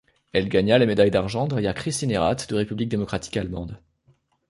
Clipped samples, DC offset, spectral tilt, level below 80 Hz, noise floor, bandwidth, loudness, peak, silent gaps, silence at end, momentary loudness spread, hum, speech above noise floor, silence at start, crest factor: under 0.1%; under 0.1%; -5.5 dB/octave; -46 dBFS; -63 dBFS; 11.5 kHz; -23 LUFS; -4 dBFS; none; 0.7 s; 10 LU; none; 40 dB; 0.35 s; 18 dB